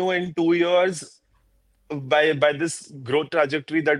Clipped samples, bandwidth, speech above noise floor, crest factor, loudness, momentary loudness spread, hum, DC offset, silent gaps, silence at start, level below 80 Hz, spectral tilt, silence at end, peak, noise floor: under 0.1%; 11.5 kHz; 41 dB; 18 dB; -22 LUFS; 15 LU; none; under 0.1%; none; 0 s; -66 dBFS; -4.5 dB/octave; 0 s; -4 dBFS; -63 dBFS